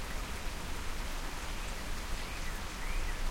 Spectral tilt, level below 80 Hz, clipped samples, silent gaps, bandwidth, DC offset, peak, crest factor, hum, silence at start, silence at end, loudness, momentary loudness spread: -3 dB/octave; -38 dBFS; under 0.1%; none; 16.5 kHz; under 0.1%; -22 dBFS; 14 dB; none; 0 s; 0 s; -41 LUFS; 2 LU